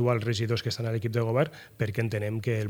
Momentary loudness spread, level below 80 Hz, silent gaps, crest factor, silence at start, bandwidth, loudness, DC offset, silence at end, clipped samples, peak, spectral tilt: 5 LU; -64 dBFS; none; 18 dB; 0 s; 17 kHz; -29 LUFS; under 0.1%; 0 s; under 0.1%; -10 dBFS; -6.5 dB/octave